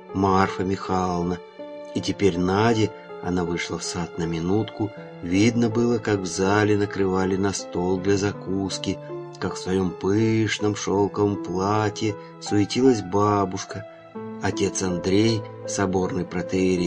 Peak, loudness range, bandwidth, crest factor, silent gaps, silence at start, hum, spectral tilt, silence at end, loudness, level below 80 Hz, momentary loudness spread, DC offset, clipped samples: -2 dBFS; 2 LU; 10 kHz; 22 dB; none; 0 s; none; -5.5 dB/octave; 0 s; -24 LUFS; -54 dBFS; 10 LU; under 0.1%; under 0.1%